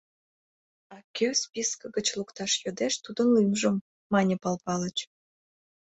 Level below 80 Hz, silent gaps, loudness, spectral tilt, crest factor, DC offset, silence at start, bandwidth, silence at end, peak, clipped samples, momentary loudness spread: -68 dBFS; 1.04-1.14 s, 3.81-4.10 s; -28 LUFS; -4 dB/octave; 18 dB; under 0.1%; 0.9 s; 8.4 kHz; 0.9 s; -12 dBFS; under 0.1%; 10 LU